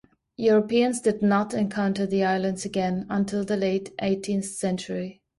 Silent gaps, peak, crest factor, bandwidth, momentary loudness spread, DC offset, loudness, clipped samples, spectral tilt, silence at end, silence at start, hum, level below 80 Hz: none; -10 dBFS; 14 dB; 11.5 kHz; 7 LU; under 0.1%; -25 LUFS; under 0.1%; -5.5 dB/octave; 0.25 s; 0.4 s; none; -60 dBFS